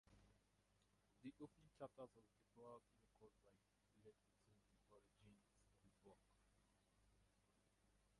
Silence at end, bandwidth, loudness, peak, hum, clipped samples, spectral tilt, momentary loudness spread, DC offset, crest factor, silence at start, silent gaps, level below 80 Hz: 0 s; 11 kHz; -63 LUFS; -42 dBFS; 50 Hz at -85 dBFS; under 0.1%; -6.5 dB/octave; 6 LU; under 0.1%; 26 dB; 0.05 s; none; -86 dBFS